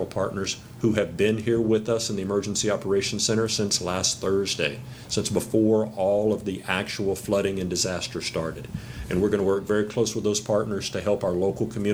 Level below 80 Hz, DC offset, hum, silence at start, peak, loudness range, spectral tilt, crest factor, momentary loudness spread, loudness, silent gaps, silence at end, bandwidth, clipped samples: -50 dBFS; under 0.1%; none; 0 s; -6 dBFS; 2 LU; -4 dB/octave; 18 dB; 6 LU; -25 LUFS; none; 0 s; over 20 kHz; under 0.1%